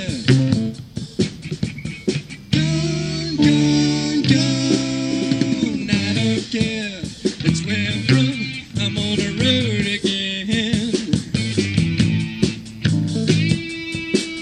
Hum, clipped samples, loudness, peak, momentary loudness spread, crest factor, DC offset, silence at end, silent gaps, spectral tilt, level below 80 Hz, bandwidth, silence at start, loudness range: none; under 0.1%; -20 LUFS; -2 dBFS; 9 LU; 18 dB; under 0.1%; 0 s; none; -5.5 dB/octave; -44 dBFS; 11 kHz; 0 s; 2 LU